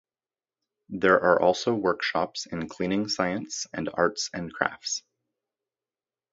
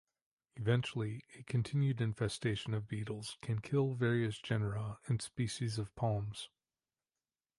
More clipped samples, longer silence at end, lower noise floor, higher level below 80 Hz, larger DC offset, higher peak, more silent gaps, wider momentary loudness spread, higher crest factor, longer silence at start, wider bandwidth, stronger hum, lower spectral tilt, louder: neither; first, 1.35 s vs 1.1 s; about the same, under -90 dBFS vs under -90 dBFS; about the same, -62 dBFS vs -64 dBFS; neither; first, -4 dBFS vs -18 dBFS; neither; about the same, 11 LU vs 9 LU; first, 24 dB vs 18 dB; first, 0.9 s vs 0.55 s; second, 8 kHz vs 11.5 kHz; neither; second, -4 dB/octave vs -6 dB/octave; first, -26 LUFS vs -37 LUFS